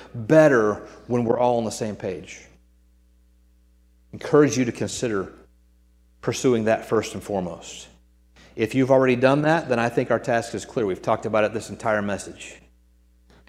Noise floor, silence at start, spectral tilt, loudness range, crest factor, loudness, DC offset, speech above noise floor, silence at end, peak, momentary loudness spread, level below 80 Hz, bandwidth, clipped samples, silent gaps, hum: -57 dBFS; 0 s; -5.5 dB/octave; 5 LU; 22 dB; -22 LUFS; under 0.1%; 35 dB; 0.95 s; -2 dBFS; 19 LU; -56 dBFS; 15 kHz; under 0.1%; none; none